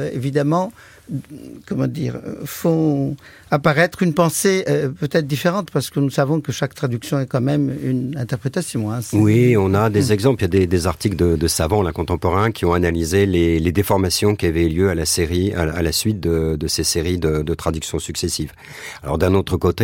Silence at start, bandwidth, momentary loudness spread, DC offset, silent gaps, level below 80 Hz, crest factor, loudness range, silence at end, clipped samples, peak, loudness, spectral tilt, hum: 0 s; 17 kHz; 9 LU; under 0.1%; none; -36 dBFS; 16 dB; 4 LU; 0 s; under 0.1%; -4 dBFS; -19 LUFS; -5.5 dB/octave; none